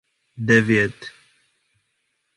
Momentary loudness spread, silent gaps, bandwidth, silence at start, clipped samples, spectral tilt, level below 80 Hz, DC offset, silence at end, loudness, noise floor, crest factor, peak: 23 LU; none; 11.5 kHz; 0.35 s; under 0.1%; -6 dB/octave; -56 dBFS; under 0.1%; 1.3 s; -19 LUFS; -72 dBFS; 22 dB; -2 dBFS